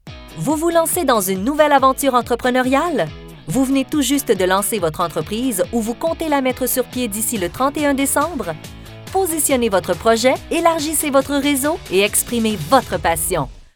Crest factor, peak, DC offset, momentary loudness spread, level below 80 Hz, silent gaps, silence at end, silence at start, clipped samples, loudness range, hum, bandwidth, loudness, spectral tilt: 18 dB; 0 dBFS; under 0.1%; 7 LU; -42 dBFS; none; 0.1 s; 0.05 s; under 0.1%; 3 LU; none; over 20 kHz; -17 LUFS; -3.5 dB/octave